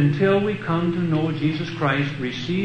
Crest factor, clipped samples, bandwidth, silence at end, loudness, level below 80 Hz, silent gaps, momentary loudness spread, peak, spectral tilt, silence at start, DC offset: 16 dB; under 0.1%; 8.6 kHz; 0 s; -22 LUFS; -54 dBFS; none; 6 LU; -6 dBFS; -7.5 dB/octave; 0 s; under 0.1%